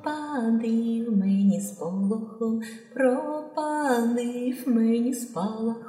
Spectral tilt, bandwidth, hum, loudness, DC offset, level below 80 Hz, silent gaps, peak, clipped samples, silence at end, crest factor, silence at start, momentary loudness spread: -6.5 dB/octave; 16 kHz; none; -26 LUFS; under 0.1%; -82 dBFS; none; -10 dBFS; under 0.1%; 0 s; 16 dB; 0 s; 7 LU